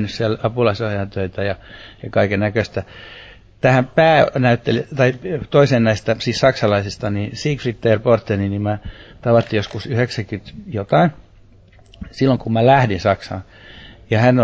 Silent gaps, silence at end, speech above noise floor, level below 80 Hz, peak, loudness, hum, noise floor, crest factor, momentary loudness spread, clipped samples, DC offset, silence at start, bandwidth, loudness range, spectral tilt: none; 0 s; 30 dB; -42 dBFS; -2 dBFS; -18 LUFS; none; -47 dBFS; 16 dB; 15 LU; under 0.1%; under 0.1%; 0 s; 8 kHz; 5 LU; -7 dB/octave